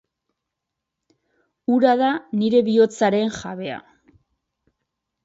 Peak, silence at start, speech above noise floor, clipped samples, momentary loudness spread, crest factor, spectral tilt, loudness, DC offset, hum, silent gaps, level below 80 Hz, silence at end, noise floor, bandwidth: -4 dBFS; 1.7 s; 63 dB; under 0.1%; 14 LU; 20 dB; -6 dB/octave; -20 LUFS; under 0.1%; none; none; -64 dBFS; 1.45 s; -82 dBFS; 8 kHz